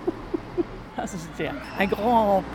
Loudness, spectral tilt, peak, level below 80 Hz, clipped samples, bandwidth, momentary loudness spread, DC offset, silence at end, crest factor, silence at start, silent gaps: -26 LUFS; -6 dB/octave; -8 dBFS; -46 dBFS; under 0.1%; 18 kHz; 12 LU; under 0.1%; 0 s; 18 dB; 0 s; none